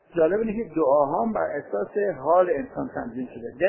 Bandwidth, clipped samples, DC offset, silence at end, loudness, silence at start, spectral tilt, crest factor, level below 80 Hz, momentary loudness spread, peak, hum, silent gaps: 3.2 kHz; under 0.1%; under 0.1%; 0 s; -24 LUFS; 0.15 s; -11.5 dB/octave; 16 dB; -56 dBFS; 11 LU; -8 dBFS; none; none